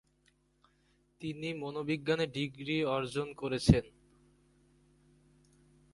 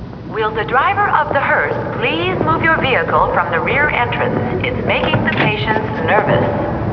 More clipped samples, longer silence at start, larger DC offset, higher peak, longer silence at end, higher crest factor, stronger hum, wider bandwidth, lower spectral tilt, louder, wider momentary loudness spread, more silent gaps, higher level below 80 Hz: neither; first, 1.2 s vs 0 s; neither; second, -8 dBFS vs 0 dBFS; first, 2.05 s vs 0 s; first, 28 dB vs 16 dB; neither; first, 11.5 kHz vs 5.4 kHz; second, -6.5 dB/octave vs -8 dB/octave; second, -33 LUFS vs -15 LUFS; first, 11 LU vs 5 LU; neither; second, -50 dBFS vs -36 dBFS